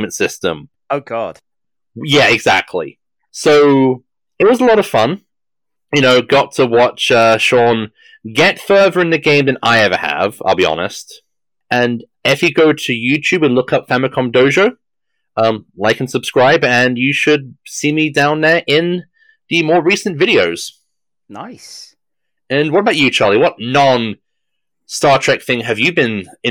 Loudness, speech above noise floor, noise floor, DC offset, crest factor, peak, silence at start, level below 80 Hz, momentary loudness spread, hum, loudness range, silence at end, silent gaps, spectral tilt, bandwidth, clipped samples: -13 LUFS; 73 dB; -86 dBFS; under 0.1%; 12 dB; -2 dBFS; 0 s; -56 dBFS; 13 LU; none; 4 LU; 0 s; none; -4.5 dB/octave; 19 kHz; under 0.1%